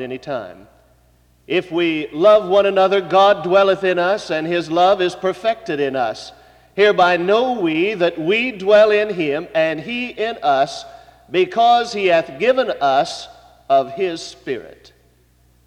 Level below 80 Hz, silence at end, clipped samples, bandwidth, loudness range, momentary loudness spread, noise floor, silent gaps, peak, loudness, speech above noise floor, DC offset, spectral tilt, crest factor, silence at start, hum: -56 dBFS; 0.95 s; under 0.1%; 10.5 kHz; 3 LU; 14 LU; -55 dBFS; none; -2 dBFS; -17 LUFS; 38 dB; under 0.1%; -5 dB/octave; 14 dB; 0 s; none